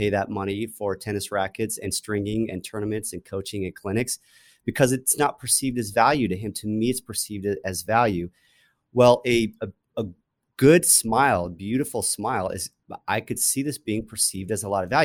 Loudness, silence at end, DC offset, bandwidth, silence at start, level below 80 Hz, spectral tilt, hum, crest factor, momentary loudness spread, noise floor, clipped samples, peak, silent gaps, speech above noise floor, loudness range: -24 LUFS; 0 s; under 0.1%; over 20 kHz; 0 s; -54 dBFS; -4 dB/octave; none; 20 dB; 14 LU; -50 dBFS; under 0.1%; -4 dBFS; none; 27 dB; 7 LU